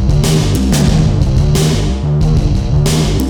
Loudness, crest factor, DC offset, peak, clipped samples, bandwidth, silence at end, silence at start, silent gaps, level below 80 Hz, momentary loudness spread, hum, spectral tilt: -12 LUFS; 10 dB; under 0.1%; 0 dBFS; under 0.1%; 18.5 kHz; 0 s; 0 s; none; -16 dBFS; 3 LU; none; -6 dB/octave